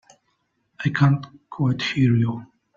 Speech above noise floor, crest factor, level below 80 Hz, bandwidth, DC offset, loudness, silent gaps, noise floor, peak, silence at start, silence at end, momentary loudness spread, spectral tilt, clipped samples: 50 dB; 18 dB; -58 dBFS; 7.4 kHz; under 0.1%; -22 LUFS; none; -71 dBFS; -6 dBFS; 0.8 s; 0.3 s; 10 LU; -7 dB/octave; under 0.1%